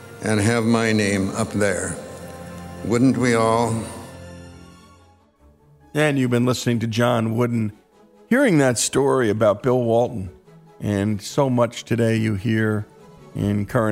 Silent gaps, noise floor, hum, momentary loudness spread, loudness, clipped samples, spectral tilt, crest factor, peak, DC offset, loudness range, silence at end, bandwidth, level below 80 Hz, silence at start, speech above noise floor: none; -54 dBFS; none; 18 LU; -20 LUFS; under 0.1%; -5.5 dB/octave; 14 dB; -6 dBFS; under 0.1%; 4 LU; 0 s; 16 kHz; -52 dBFS; 0 s; 35 dB